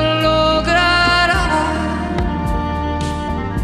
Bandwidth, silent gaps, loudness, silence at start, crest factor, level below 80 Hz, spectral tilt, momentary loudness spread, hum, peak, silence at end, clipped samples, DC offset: 14 kHz; none; -16 LUFS; 0 s; 14 dB; -26 dBFS; -5 dB/octave; 9 LU; none; -2 dBFS; 0 s; under 0.1%; under 0.1%